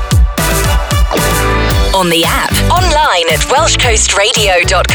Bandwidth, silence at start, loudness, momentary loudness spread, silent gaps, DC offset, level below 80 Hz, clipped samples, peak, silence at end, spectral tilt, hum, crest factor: over 20 kHz; 0 s; -10 LUFS; 4 LU; none; under 0.1%; -16 dBFS; under 0.1%; -2 dBFS; 0 s; -3 dB/octave; none; 8 dB